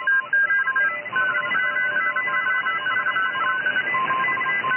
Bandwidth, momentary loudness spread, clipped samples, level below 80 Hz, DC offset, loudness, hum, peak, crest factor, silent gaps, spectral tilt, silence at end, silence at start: 3.2 kHz; 3 LU; under 0.1%; -82 dBFS; under 0.1%; -21 LUFS; none; -12 dBFS; 10 dB; none; -6.5 dB/octave; 0 s; 0 s